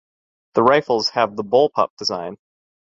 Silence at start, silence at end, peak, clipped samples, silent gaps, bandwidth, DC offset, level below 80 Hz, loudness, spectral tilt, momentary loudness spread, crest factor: 0.55 s; 0.6 s; -2 dBFS; under 0.1%; 1.90-1.97 s; 7.8 kHz; under 0.1%; -60 dBFS; -19 LUFS; -4.5 dB/octave; 8 LU; 18 dB